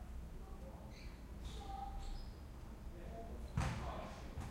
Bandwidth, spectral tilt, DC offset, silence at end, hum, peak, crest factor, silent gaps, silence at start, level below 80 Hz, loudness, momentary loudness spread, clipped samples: 16 kHz; -6 dB/octave; under 0.1%; 0 s; none; -26 dBFS; 20 dB; none; 0 s; -50 dBFS; -49 LUFS; 11 LU; under 0.1%